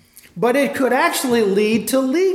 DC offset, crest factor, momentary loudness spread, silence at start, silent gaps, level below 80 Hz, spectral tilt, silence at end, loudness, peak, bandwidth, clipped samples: under 0.1%; 12 dB; 2 LU; 0.35 s; none; -62 dBFS; -4 dB/octave; 0 s; -17 LUFS; -4 dBFS; 17 kHz; under 0.1%